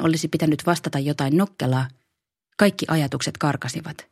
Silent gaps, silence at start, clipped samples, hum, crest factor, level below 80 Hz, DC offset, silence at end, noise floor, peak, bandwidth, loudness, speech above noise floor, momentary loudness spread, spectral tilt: none; 0 s; under 0.1%; none; 22 dB; -60 dBFS; under 0.1%; 0.1 s; -79 dBFS; 0 dBFS; 15 kHz; -23 LUFS; 57 dB; 9 LU; -5.5 dB/octave